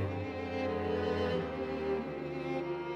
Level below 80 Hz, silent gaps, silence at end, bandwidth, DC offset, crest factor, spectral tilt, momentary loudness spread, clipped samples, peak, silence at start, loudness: -60 dBFS; none; 0 s; 9 kHz; under 0.1%; 12 dB; -7.5 dB/octave; 5 LU; under 0.1%; -22 dBFS; 0 s; -35 LUFS